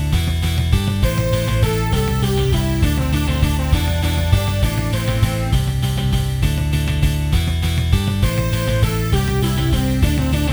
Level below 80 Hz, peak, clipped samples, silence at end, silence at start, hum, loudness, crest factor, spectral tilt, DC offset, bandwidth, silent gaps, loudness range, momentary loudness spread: -22 dBFS; 0 dBFS; under 0.1%; 0 s; 0 s; none; -18 LUFS; 16 dB; -6 dB/octave; under 0.1%; over 20 kHz; none; 1 LU; 2 LU